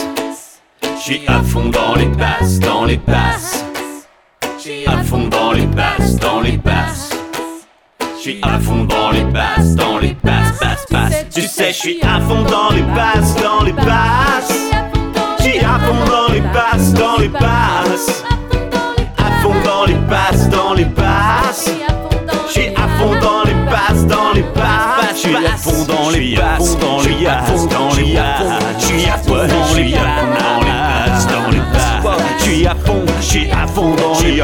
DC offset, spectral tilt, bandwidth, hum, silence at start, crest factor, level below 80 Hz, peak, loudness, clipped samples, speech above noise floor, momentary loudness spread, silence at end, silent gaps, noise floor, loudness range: under 0.1%; -5 dB/octave; 18 kHz; none; 0 s; 12 dB; -22 dBFS; 0 dBFS; -13 LUFS; under 0.1%; 24 dB; 6 LU; 0 s; none; -36 dBFS; 3 LU